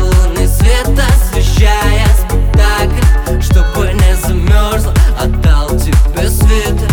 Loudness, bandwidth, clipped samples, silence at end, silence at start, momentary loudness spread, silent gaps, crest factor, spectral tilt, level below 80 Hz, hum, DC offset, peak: -11 LUFS; 18.5 kHz; under 0.1%; 0 s; 0 s; 2 LU; none; 8 dB; -5.5 dB/octave; -10 dBFS; none; under 0.1%; 0 dBFS